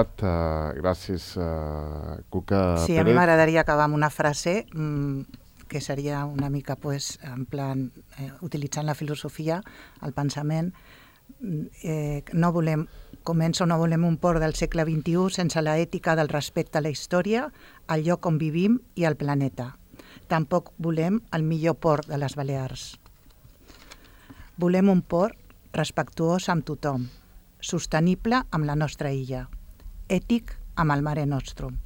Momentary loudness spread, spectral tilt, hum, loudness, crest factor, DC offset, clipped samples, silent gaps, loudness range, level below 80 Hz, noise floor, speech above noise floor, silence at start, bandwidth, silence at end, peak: 13 LU; -6.5 dB/octave; none; -26 LUFS; 20 dB; under 0.1%; under 0.1%; none; 8 LU; -44 dBFS; -52 dBFS; 27 dB; 0 s; 16.5 kHz; 0 s; -6 dBFS